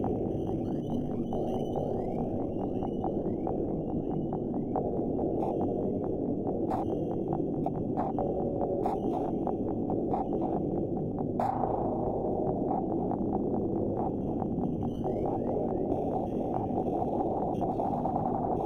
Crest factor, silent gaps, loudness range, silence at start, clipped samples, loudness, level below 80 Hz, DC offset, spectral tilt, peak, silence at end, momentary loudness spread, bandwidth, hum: 18 dB; none; 1 LU; 0 s; under 0.1%; -32 LUFS; -48 dBFS; 0.1%; -10.5 dB/octave; -14 dBFS; 0 s; 2 LU; 9.4 kHz; none